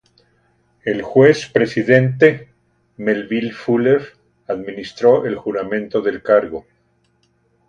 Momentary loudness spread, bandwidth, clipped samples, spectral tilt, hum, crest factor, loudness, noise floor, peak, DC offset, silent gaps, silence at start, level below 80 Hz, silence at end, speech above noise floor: 14 LU; 8.8 kHz; under 0.1%; -7 dB/octave; none; 18 dB; -17 LUFS; -62 dBFS; 0 dBFS; under 0.1%; none; 0.85 s; -56 dBFS; 1.1 s; 46 dB